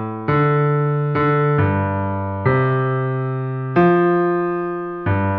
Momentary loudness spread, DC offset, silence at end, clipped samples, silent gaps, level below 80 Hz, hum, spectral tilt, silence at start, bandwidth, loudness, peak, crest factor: 8 LU; under 0.1%; 0 s; under 0.1%; none; -48 dBFS; none; -11 dB/octave; 0 s; 4.7 kHz; -18 LUFS; -4 dBFS; 14 dB